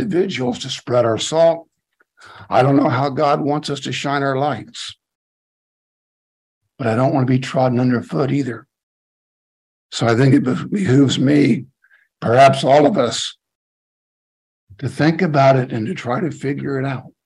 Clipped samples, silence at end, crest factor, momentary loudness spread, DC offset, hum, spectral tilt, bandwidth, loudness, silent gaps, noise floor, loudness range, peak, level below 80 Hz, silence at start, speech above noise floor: under 0.1%; 0.2 s; 18 dB; 12 LU; under 0.1%; none; -6 dB/octave; 11.5 kHz; -17 LUFS; 5.15-6.61 s, 8.83-9.89 s, 13.55-14.67 s; -61 dBFS; 7 LU; 0 dBFS; -60 dBFS; 0 s; 45 dB